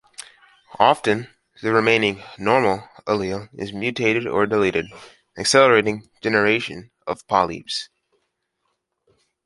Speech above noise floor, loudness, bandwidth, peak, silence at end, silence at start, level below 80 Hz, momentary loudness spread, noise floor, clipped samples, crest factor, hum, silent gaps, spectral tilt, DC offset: 54 dB; -20 LUFS; 11.5 kHz; 0 dBFS; 1.6 s; 0.2 s; -56 dBFS; 15 LU; -74 dBFS; under 0.1%; 20 dB; none; none; -4 dB/octave; under 0.1%